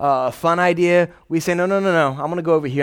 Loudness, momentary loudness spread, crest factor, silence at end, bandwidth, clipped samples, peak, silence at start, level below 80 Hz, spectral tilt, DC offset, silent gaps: -18 LUFS; 6 LU; 14 dB; 0 s; 18 kHz; under 0.1%; -4 dBFS; 0 s; -58 dBFS; -6 dB/octave; under 0.1%; none